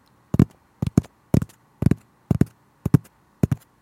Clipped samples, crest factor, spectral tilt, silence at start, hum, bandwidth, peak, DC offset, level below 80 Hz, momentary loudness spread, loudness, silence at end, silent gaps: under 0.1%; 24 dB; -8.5 dB/octave; 0.35 s; none; 16.5 kHz; 0 dBFS; under 0.1%; -42 dBFS; 7 LU; -24 LUFS; 0.25 s; none